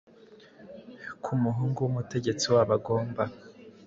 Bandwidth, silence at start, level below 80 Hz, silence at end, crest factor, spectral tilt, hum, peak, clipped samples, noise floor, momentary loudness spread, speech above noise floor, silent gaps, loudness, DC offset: 7.8 kHz; 0.3 s; -62 dBFS; 0.15 s; 18 dB; -6 dB/octave; none; -10 dBFS; under 0.1%; -54 dBFS; 23 LU; 27 dB; none; -28 LUFS; under 0.1%